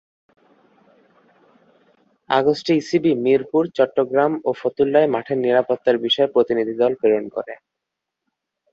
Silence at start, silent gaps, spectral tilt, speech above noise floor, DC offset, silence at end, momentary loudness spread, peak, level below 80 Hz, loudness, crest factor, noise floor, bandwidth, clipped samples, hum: 2.3 s; none; -6 dB/octave; 64 dB; under 0.1%; 1.15 s; 5 LU; -2 dBFS; -64 dBFS; -19 LUFS; 18 dB; -82 dBFS; 7.6 kHz; under 0.1%; none